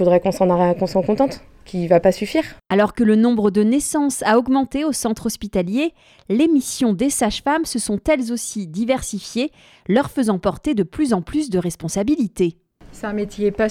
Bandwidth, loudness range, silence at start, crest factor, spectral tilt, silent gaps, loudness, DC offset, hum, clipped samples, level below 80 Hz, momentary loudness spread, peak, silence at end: 16 kHz; 4 LU; 0 s; 16 dB; -5 dB/octave; none; -19 LUFS; under 0.1%; none; under 0.1%; -44 dBFS; 9 LU; -2 dBFS; 0 s